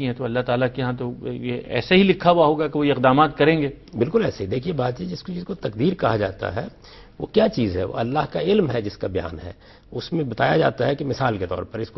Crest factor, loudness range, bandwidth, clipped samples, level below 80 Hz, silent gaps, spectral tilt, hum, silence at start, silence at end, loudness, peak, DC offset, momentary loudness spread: 20 dB; 5 LU; 6.2 kHz; under 0.1%; -48 dBFS; none; -8 dB/octave; none; 0 s; 0.1 s; -22 LUFS; -2 dBFS; under 0.1%; 13 LU